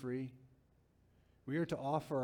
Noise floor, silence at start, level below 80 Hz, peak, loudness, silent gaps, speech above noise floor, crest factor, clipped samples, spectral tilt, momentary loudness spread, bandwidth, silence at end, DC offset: -71 dBFS; 0 s; -72 dBFS; -22 dBFS; -40 LUFS; none; 33 dB; 20 dB; under 0.1%; -7.5 dB/octave; 12 LU; 17.5 kHz; 0 s; under 0.1%